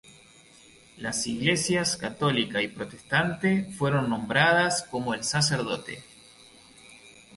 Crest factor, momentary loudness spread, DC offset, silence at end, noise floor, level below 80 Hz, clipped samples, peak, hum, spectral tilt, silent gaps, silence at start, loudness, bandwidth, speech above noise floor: 20 dB; 10 LU; under 0.1%; 0.25 s; -54 dBFS; -60 dBFS; under 0.1%; -8 dBFS; none; -4 dB/octave; none; 0.1 s; -26 LUFS; 12 kHz; 28 dB